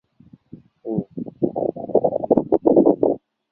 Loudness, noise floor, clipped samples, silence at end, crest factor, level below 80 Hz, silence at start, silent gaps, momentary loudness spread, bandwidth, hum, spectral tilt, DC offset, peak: -20 LUFS; -51 dBFS; under 0.1%; 0.35 s; 18 dB; -56 dBFS; 0.55 s; none; 13 LU; 2.1 kHz; none; -13.5 dB/octave; under 0.1%; -2 dBFS